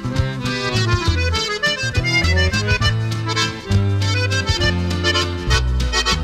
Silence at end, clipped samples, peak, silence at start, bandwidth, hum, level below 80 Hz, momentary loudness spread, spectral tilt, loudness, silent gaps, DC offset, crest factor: 0 s; under 0.1%; -4 dBFS; 0 s; 14 kHz; none; -26 dBFS; 4 LU; -4 dB/octave; -18 LUFS; none; under 0.1%; 14 dB